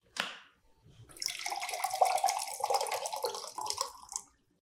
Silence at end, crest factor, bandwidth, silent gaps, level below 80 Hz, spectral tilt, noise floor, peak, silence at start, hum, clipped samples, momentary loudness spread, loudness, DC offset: 0.35 s; 22 dB; 18 kHz; none; -74 dBFS; 0.5 dB/octave; -63 dBFS; -14 dBFS; 0.15 s; none; under 0.1%; 12 LU; -34 LUFS; under 0.1%